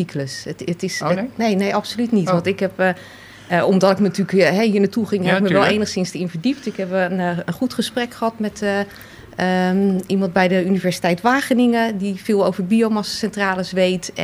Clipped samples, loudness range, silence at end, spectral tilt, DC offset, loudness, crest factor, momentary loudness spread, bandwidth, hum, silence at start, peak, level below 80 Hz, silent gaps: under 0.1%; 4 LU; 0 s; -5.5 dB/octave; under 0.1%; -19 LUFS; 16 dB; 8 LU; 15 kHz; none; 0 s; -2 dBFS; -56 dBFS; none